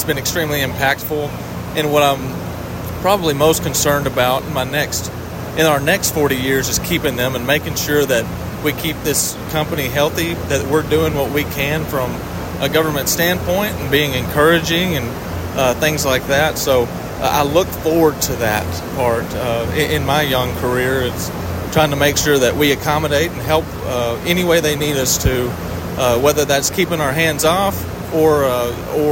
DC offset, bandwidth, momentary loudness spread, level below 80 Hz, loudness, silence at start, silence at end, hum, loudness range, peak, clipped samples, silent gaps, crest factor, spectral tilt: under 0.1%; 16.5 kHz; 8 LU; -36 dBFS; -17 LUFS; 0 s; 0 s; none; 2 LU; -2 dBFS; under 0.1%; none; 16 dB; -4 dB/octave